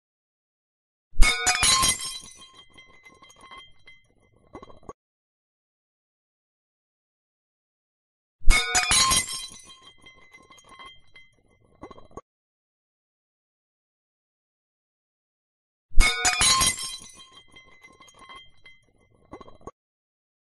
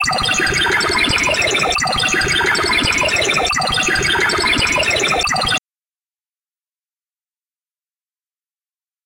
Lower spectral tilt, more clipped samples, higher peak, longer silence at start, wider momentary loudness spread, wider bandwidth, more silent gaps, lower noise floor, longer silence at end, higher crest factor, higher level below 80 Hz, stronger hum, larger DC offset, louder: second, -0.5 dB/octave vs -2 dB/octave; neither; about the same, -2 dBFS vs -2 dBFS; first, 1.15 s vs 0 s; first, 28 LU vs 2 LU; second, 14.5 kHz vs 17 kHz; first, 4.94-8.39 s, 12.22-15.89 s vs none; second, -61 dBFS vs under -90 dBFS; second, 0.9 s vs 3.5 s; first, 26 dB vs 16 dB; first, -32 dBFS vs -38 dBFS; neither; neither; second, -21 LUFS vs -14 LUFS